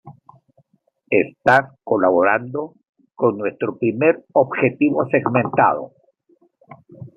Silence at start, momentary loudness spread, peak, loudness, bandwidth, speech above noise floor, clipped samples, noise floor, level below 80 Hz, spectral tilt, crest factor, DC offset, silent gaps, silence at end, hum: 0.05 s; 12 LU; -2 dBFS; -18 LUFS; 8.2 kHz; 46 dB; under 0.1%; -64 dBFS; -64 dBFS; -8.5 dB/octave; 18 dB; under 0.1%; 2.89-2.93 s; 0.1 s; none